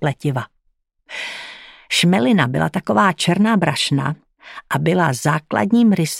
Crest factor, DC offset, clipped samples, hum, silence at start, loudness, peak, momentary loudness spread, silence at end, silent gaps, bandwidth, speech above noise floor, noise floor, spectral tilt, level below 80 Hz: 18 dB; under 0.1%; under 0.1%; none; 0 s; -17 LUFS; 0 dBFS; 17 LU; 0 s; none; 16 kHz; 49 dB; -66 dBFS; -5 dB/octave; -56 dBFS